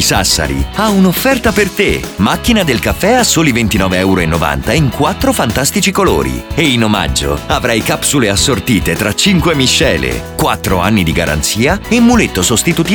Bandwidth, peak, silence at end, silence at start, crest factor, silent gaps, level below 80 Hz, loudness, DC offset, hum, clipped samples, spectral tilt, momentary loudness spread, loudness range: over 20 kHz; 0 dBFS; 0 s; 0 s; 12 dB; none; -26 dBFS; -11 LUFS; under 0.1%; none; under 0.1%; -4 dB/octave; 5 LU; 1 LU